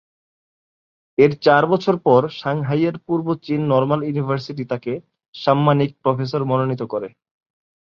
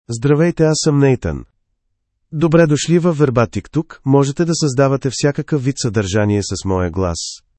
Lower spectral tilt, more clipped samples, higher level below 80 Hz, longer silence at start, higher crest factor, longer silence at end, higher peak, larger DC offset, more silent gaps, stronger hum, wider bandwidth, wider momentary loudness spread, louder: first, -8.5 dB/octave vs -6 dB/octave; neither; second, -60 dBFS vs -42 dBFS; first, 1.2 s vs 0.1 s; about the same, 18 dB vs 16 dB; first, 0.85 s vs 0.2 s; about the same, -2 dBFS vs 0 dBFS; neither; first, 5.28-5.33 s vs none; neither; second, 6.8 kHz vs 8.8 kHz; first, 11 LU vs 8 LU; second, -19 LUFS vs -16 LUFS